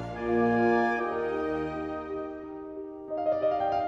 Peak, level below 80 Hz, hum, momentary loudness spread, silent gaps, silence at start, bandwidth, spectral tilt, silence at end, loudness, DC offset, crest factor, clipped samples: -14 dBFS; -54 dBFS; none; 16 LU; none; 0 s; 7.6 kHz; -7.5 dB/octave; 0 s; -29 LUFS; under 0.1%; 14 dB; under 0.1%